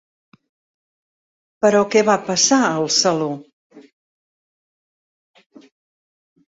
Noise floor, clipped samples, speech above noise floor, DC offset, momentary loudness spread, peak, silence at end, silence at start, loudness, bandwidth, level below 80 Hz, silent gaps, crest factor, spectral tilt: under -90 dBFS; under 0.1%; over 74 dB; under 0.1%; 9 LU; -2 dBFS; 2.7 s; 1.6 s; -16 LUFS; 8 kHz; -66 dBFS; 3.53-3.70 s; 20 dB; -3 dB/octave